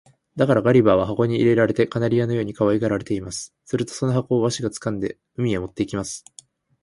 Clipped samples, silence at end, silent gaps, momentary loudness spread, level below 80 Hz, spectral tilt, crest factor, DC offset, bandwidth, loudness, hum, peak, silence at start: under 0.1%; 0.65 s; none; 12 LU; -50 dBFS; -6.5 dB/octave; 18 dB; under 0.1%; 11.5 kHz; -21 LUFS; none; -4 dBFS; 0.35 s